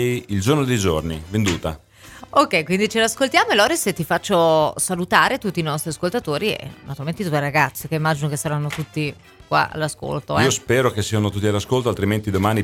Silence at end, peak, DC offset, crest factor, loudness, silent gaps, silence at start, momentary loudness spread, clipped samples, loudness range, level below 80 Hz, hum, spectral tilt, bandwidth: 0 s; 0 dBFS; under 0.1%; 20 dB; -20 LUFS; none; 0 s; 9 LU; under 0.1%; 5 LU; -46 dBFS; none; -4.5 dB/octave; 17.5 kHz